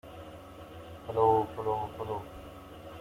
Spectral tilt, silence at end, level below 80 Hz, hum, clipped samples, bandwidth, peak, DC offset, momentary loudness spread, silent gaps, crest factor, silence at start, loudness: -7.5 dB/octave; 0 s; -58 dBFS; none; under 0.1%; 16 kHz; -12 dBFS; under 0.1%; 21 LU; none; 20 dB; 0.05 s; -31 LUFS